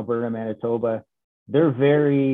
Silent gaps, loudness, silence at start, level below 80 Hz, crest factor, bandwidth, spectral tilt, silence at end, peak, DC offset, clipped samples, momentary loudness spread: 1.24-1.46 s; -22 LUFS; 0 s; -68 dBFS; 16 dB; 3.9 kHz; -10.5 dB/octave; 0 s; -6 dBFS; under 0.1%; under 0.1%; 9 LU